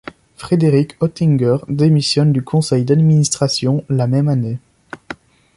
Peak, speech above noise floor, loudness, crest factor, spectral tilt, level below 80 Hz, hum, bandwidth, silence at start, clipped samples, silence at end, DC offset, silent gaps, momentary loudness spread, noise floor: -2 dBFS; 21 dB; -15 LUFS; 14 dB; -6.5 dB/octave; -52 dBFS; none; 11.5 kHz; 0.4 s; under 0.1%; 0.4 s; under 0.1%; none; 19 LU; -35 dBFS